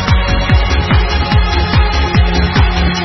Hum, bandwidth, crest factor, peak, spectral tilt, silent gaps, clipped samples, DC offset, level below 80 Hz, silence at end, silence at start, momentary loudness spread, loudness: none; 6.2 kHz; 10 dB; 0 dBFS; -6 dB/octave; none; under 0.1%; under 0.1%; -14 dBFS; 0 s; 0 s; 1 LU; -12 LUFS